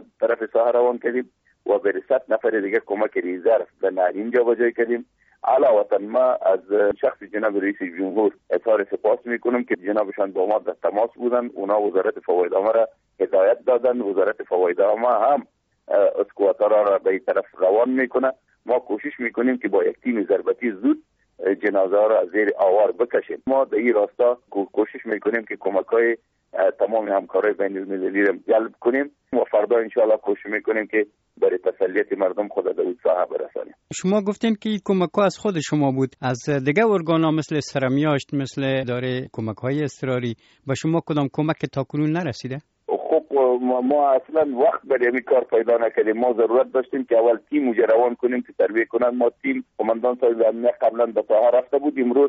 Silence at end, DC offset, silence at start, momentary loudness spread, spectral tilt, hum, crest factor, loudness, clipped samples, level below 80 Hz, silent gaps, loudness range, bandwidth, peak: 0 s; under 0.1%; 0.2 s; 7 LU; -5.5 dB/octave; none; 14 dB; -21 LUFS; under 0.1%; -66 dBFS; none; 3 LU; 7.6 kHz; -6 dBFS